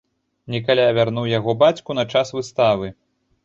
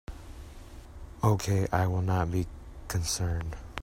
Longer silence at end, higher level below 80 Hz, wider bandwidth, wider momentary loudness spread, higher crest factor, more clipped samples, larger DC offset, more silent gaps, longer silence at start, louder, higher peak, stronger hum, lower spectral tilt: first, 0.5 s vs 0 s; second, -54 dBFS vs -44 dBFS; second, 7.8 kHz vs 16 kHz; second, 9 LU vs 21 LU; about the same, 18 dB vs 22 dB; neither; neither; neither; first, 0.5 s vs 0.1 s; first, -19 LUFS vs -30 LUFS; first, -2 dBFS vs -10 dBFS; neither; about the same, -6 dB/octave vs -5.5 dB/octave